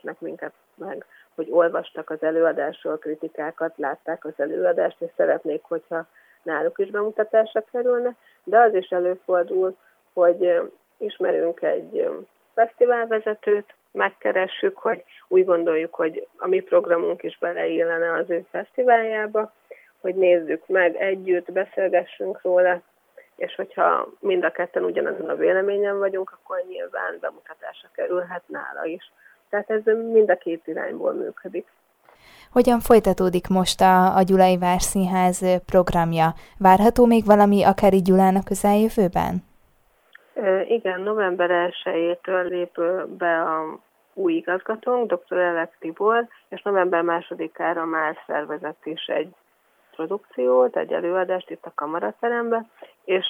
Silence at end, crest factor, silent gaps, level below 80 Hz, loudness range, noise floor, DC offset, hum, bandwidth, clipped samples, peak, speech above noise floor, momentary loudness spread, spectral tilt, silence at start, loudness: 0 s; 20 dB; none; -48 dBFS; 7 LU; -63 dBFS; under 0.1%; none; 17 kHz; under 0.1%; -2 dBFS; 41 dB; 15 LU; -5.5 dB/octave; 0.05 s; -22 LUFS